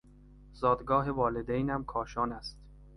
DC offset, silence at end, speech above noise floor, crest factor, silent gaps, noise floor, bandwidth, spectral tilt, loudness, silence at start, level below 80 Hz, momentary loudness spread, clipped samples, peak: under 0.1%; 0 s; 24 dB; 20 dB; none; -55 dBFS; 11.5 kHz; -7.5 dB/octave; -31 LUFS; 0.25 s; -50 dBFS; 8 LU; under 0.1%; -12 dBFS